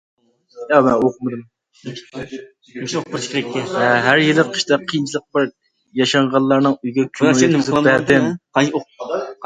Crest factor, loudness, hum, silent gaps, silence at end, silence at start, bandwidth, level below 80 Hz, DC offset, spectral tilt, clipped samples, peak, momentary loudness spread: 18 dB; -17 LUFS; none; none; 0 s; 0.55 s; 9.4 kHz; -56 dBFS; under 0.1%; -5 dB/octave; under 0.1%; 0 dBFS; 18 LU